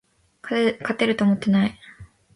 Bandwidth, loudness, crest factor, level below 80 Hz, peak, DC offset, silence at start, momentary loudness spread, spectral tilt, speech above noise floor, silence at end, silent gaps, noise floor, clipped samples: 11 kHz; -22 LUFS; 18 dB; -58 dBFS; -6 dBFS; under 0.1%; 0.45 s; 7 LU; -7 dB/octave; 26 dB; 0.3 s; none; -46 dBFS; under 0.1%